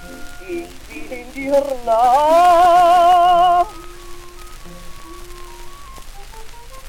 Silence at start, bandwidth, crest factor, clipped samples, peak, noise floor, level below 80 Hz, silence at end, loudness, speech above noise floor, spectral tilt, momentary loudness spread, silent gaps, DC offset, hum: 0 s; 16.5 kHz; 14 dB; under 0.1%; -4 dBFS; -34 dBFS; -38 dBFS; 0 s; -13 LUFS; 19 dB; -3.5 dB/octave; 25 LU; none; under 0.1%; none